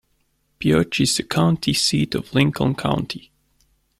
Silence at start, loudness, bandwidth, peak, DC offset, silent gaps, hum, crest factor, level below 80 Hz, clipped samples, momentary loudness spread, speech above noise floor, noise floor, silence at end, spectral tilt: 0.6 s; -20 LUFS; 15.5 kHz; -4 dBFS; under 0.1%; none; none; 18 dB; -48 dBFS; under 0.1%; 7 LU; 47 dB; -66 dBFS; 0.8 s; -4.5 dB/octave